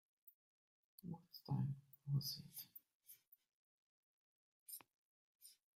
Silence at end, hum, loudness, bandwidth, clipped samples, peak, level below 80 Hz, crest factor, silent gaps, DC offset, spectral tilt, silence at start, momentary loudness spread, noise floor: 0.25 s; none; -48 LUFS; 16 kHz; under 0.1%; -30 dBFS; -84 dBFS; 22 dB; 0.34-0.98 s, 2.95-3.00 s, 3.27-3.32 s, 3.53-4.66 s, 4.94-5.40 s; under 0.1%; -5.5 dB/octave; 0.25 s; 23 LU; -68 dBFS